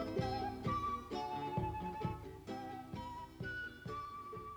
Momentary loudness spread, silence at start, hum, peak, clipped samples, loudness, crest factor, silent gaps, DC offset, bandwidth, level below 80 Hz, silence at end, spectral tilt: 8 LU; 0 s; none; -26 dBFS; under 0.1%; -43 LUFS; 16 dB; none; under 0.1%; over 20 kHz; -56 dBFS; 0 s; -6.5 dB/octave